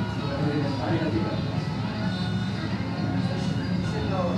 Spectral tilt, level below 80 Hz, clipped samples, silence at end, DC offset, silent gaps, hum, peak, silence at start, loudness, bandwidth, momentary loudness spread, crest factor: -7 dB/octave; -46 dBFS; under 0.1%; 0 s; under 0.1%; none; none; -14 dBFS; 0 s; -27 LUFS; 10.5 kHz; 3 LU; 12 dB